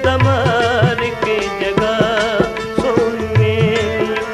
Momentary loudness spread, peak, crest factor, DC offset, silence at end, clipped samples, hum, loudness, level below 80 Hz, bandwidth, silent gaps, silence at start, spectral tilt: 4 LU; 0 dBFS; 14 dB; under 0.1%; 0 s; under 0.1%; none; -16 LUFS; -38 dBFS; 13.5 kHz; none; 0 s; -6 dB/octave